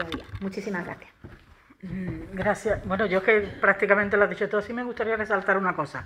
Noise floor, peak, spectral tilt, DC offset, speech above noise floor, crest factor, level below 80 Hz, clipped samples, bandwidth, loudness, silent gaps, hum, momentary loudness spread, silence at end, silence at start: -52 dBFS; -4 dBFS; -6 dB/octave; under 0.1%; 27 dB; 22 dB; -50 dBFS; under 0.1%; 12.5 kHz; -25 LUFS; none; none; 13 LU; 0 s; 0 s